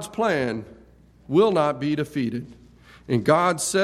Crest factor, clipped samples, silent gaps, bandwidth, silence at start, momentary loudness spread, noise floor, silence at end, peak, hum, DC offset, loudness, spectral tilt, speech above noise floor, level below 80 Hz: 20 dB; under 0.1%; none; 15.5 kHz; 0 s; 10 LU; -52 dBFS; 0 s; -4 dBFS; none; under 0.1%; -22 LUFS; -5 dB/octave; 30 dB; -56 dBFS